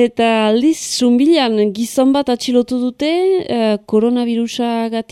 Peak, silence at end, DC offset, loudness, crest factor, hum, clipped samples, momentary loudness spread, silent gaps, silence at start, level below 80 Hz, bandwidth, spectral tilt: -2 dBFS; 0.1 s; under 0.1%; -15 LUFS; 12 dB; none; under 0.1%; 6 LU; none; 0 s; -56 dBFS; 14.5 kHz; -4.5 dB/octave